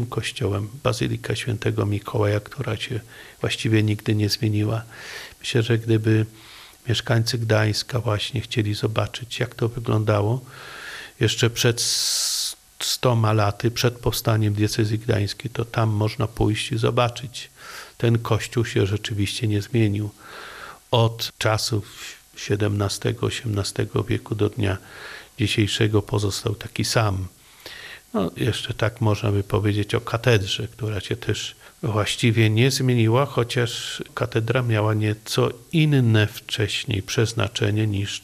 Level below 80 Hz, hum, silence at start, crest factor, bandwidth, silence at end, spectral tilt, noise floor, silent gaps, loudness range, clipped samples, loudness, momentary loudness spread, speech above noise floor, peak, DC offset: -50 dBFS; none; 0 s; 20 dB; 14.5 kHz; 0.05 s; -5 dB/octave; -41 dBFS; none; 3 LU; under 0.1%; -23 LUFS; 13 LU; 19 dB; -2 dBFS; under 0.1%